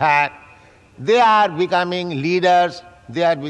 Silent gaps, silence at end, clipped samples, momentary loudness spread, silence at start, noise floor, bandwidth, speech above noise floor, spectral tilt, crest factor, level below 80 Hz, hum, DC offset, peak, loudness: none; 0 s; under 0.1%; 12 LU; 0 s; -47 dBFS; 9.6 kHz; 31 dB; -5.5 dB/octave; 14 dB; -60 dBFS; none; under 0.1%; -4 dBFS; -17 LUFS